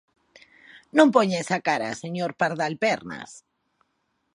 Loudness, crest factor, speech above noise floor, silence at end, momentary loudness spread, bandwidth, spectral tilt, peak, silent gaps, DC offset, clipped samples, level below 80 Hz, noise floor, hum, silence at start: -23 LUFS; 22 dB; 51 dB; 0.95 s; 15 LU; 11 kHz; -5 dB/octave; -2 dBFS; none; under 0.1%; under 0.1%; -72 dBFS; -74 dBFS; none; 0.75 s